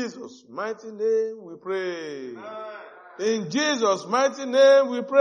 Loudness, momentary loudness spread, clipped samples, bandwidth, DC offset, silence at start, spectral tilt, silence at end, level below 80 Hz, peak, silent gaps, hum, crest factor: -23 LUFS; 21 LU; under 0.1%; 8.8 kHz; under 0.1%; 0 s; -3.5 dB/octave; 0 s; -82 dBFS; -6 dBFS; none; none; 18 dB